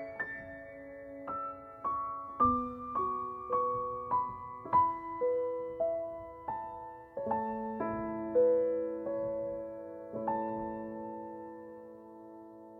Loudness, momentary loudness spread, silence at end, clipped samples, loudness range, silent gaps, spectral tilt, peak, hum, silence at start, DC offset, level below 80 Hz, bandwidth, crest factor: -35 LUFS; 18 LU; 0 s; under 0.1%; 6 LU; none; -9.5 dB/octave; -18 dBFS; none; 0 s; under 0.1%; -62 dBFS; 3.8 kHz; 18 dB